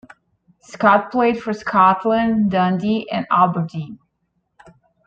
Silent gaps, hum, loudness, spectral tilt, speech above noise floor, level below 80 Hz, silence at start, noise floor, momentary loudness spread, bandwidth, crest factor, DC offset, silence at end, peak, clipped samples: none; none; -17 LUFS; -7.5 dB/octave; 53 dB; -56 dBFS; 0.7 s; -70 dBFS; 10 LU; 7.8 kHz; 18 dB; under 0.1%; 1.1 s; -2 dBFS; under 0.1%